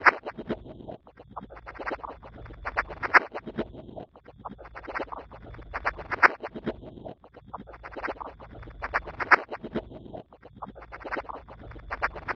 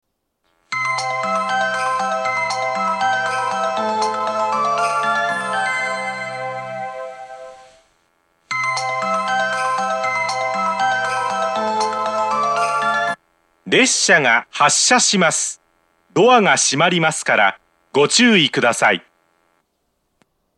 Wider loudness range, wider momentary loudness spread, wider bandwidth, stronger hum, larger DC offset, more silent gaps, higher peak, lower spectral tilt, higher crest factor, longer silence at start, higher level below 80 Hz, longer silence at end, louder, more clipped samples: second, 0 LU vs 8 LU; first, 23 LU vs 12 LU; second, 9.4 kHz vs 12.5 kHz; neither; neither; neither; about the same, -2 dBFS vs 0 dBFS; first, -5.5 dB/octave vs -2 dB/octave; first, 30 dB vs 18 dB; second, 0 s vs 0.7 s; first, -50 dBFS vs -70 dBFS; second, 0 s vs 1.55 s; second, -29 LUFS vs -17 LUFS; neither